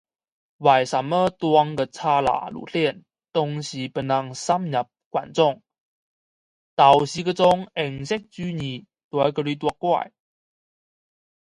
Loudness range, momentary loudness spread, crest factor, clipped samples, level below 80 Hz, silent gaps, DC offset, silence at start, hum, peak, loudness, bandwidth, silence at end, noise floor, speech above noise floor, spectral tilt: 5 LU; 11 LU; 22 dB; under 0.1%; -60 dBFS; 5.06-5.11 s, 5.78-6.77 s, 9.04-9.11 s; under 0.1%; 0.6 s; none; -2 dBFS; -22 LUFS; 11.5 kHz; 1.35 s; under -90 dBFS; over 68 dB; -5.5 dB/octave